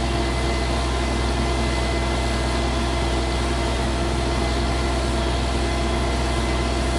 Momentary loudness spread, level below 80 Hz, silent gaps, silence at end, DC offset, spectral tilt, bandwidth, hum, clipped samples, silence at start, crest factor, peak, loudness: 1 LU; -24 dBFS; none; 0 s; under 0.1%; -5 dB/octave; 11.5 kHz; none; under 0.1%; 0 s; 12 dB; -10 dBFS; -23 LUFS